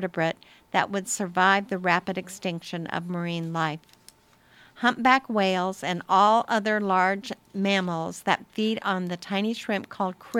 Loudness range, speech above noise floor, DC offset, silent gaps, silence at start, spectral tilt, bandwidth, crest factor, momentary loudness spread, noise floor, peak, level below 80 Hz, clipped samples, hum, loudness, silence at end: 4 LU; 33 dB; under 0.1%; none; 0 s; -4.5 dB/octave; 16 kHz; 22 dB; 11 LU; -58 dBFS; -4 dBFS; -70 dBFS; under 0.1%; none; -25 LUFS; 0 s